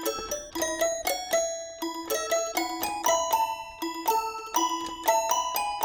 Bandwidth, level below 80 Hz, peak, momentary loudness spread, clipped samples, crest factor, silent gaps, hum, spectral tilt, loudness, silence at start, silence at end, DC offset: over 20 kHz; -58 dBFS; -8 dBFS; 8 LU; under 0.1%; 20 dB; none; none; -0.5 dB/octave; -28 LUFS; 0 s; 0 s; under 0.1%